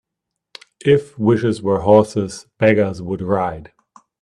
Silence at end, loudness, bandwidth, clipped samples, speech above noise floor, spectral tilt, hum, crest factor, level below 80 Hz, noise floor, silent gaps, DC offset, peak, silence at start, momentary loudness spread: 0.6 s; -17 LUFS; 11 kHz; under 0.1%; 64 dB; -7 dB/octave; none; 18 dB; -50 dBFS; -80 dBFS; none; under 0.1%; 0 dBFS; 0.85 s; 12 LU